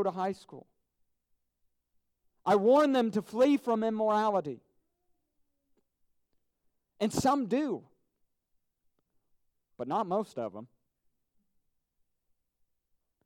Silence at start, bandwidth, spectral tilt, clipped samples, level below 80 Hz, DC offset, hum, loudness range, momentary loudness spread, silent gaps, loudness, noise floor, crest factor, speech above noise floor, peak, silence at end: 0 s; 16 kHz; -5.5 dB/octave; under 0.1%; -68 dBFS; under 0.1%; none; 11 LU; 17 LU; none; -29 LUFS; -78 dBFS; 18 dB; 50 dB; -14 dBFS; 2.6 s